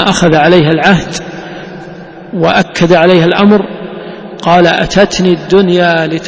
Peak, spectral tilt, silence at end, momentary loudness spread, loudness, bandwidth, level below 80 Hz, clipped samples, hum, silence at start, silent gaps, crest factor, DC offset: 0 dBFS; -5.5 dB/octave; 0 s; 19 LU; -8 LUFS; 8 kHz; -38 dBFS; 0.9%; none; 0 s; none; 10 dB; under 0.1%